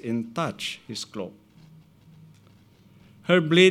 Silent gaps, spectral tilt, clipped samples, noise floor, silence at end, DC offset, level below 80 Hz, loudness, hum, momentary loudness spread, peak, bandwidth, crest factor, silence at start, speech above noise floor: none; -5 dB/octave; under 0.1%; -55 dBFS; 0 s; under 0.1%; -70 dBFS; -25 LUFS; none; 18 LU; -4 dBFS; 14 kHz; 22 dB; 0.05 s; 32 dB